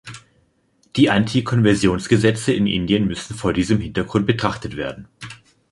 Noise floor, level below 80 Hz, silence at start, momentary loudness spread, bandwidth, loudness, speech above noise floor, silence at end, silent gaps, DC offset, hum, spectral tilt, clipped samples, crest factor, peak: -61 dBFS; -42 dBFS; 0.05 s; 15 LU; 11.5 kHz; -19 LUFS; 43 dB; 0.35 s; none; under 0.1%; none; -6 dB/octave; under 0.1%; 18 dB; -2 dBFS